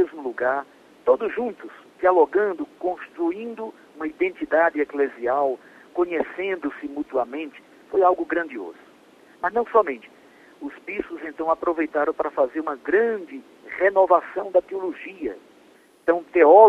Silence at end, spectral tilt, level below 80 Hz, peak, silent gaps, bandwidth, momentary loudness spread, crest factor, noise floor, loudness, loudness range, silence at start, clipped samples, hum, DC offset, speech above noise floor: 0 s; -6.5 dB/octave; -64 dBFS; 0 dBFS; none; 7 kHz; 16 LU; 22 dB; -54 dBFS; -23 LUFS; 4 LU; 0 s; under 0.1%; none; under 0.1%; 32 dB